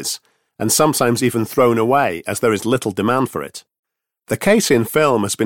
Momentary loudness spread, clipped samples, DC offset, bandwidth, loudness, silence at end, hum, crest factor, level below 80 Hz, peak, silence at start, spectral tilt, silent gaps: 11 LU; under 0.1%; 0.2%; 17.5 kHz; -17 LUFS; 0 s; none; 16 dB; -54 dBFS; -2 dBFS; 0 s; -4.5 dB/octave; 3.79-3.83 s